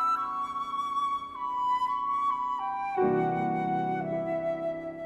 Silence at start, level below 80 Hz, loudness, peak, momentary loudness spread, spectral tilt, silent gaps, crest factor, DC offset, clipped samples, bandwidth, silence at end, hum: 0 s; -64 dBFS; -30 LUFS; -16 dBFS; 5 LU; -7 dB/octave; none; 14 dB; under 0.1%; under 0.1%; 12.5 kHz; 0 s; none